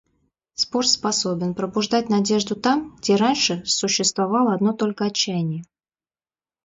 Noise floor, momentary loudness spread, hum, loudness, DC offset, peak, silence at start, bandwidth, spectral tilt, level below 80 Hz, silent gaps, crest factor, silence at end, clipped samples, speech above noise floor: under -90 dBFS; 6 LU; none; -21 LUFS; under 0.1%; -4 dBFS; 0.6 s; 7.8 kHz; -3.5 dB/octave; -62 dBFS; none; 18 dB; 1 s; under 0.1%; over 69 dB